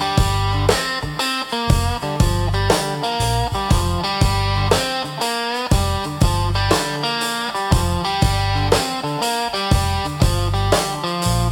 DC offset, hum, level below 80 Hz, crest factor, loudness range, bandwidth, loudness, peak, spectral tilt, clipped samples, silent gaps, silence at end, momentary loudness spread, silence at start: under 0.1%; none; -26 dBFS; 18 dB; 1 LU; 17.5 kHz; -19 LUFS; 0 dBFS; -4.5 dB/octave; under 0.1%; none; 0 s; 4 LU; 0 s